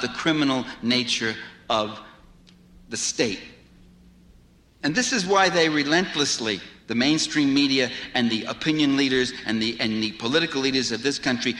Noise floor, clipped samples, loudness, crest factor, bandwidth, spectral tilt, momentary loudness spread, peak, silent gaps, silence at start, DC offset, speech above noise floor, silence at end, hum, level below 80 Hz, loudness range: -54 dBFS; under 0.1%; -23 LUFS; 16 dB; 11.5 kHz; -3 dB/octave; 8 LU; -8 dBFS; none; 0 s; under 0.1%; 31 dB; 0 s; none; -56 dBFS; 8 LU